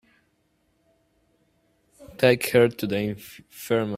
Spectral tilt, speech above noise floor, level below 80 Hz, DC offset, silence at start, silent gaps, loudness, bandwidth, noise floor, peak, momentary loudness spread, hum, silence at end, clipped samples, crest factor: -5.5 dB/octave; 46 dB; -60 dBFS; under 0.1%; 2 s; none; -23 LUFS; 16 kHz; -69 dBFS; -2 dBFS; 22 LU; none; 0 s; under 0.1%; 24 dB